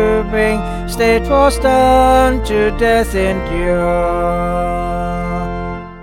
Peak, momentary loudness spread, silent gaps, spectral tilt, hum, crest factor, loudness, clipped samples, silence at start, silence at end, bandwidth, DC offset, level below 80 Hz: -2 dBFS; 10 LU; none; -5.5 dB/octave; none; 12 dB; -14 LUFS; under 0.1%; 0 s; 0 s; 17 kHz; under 0.1%; -24 dBFS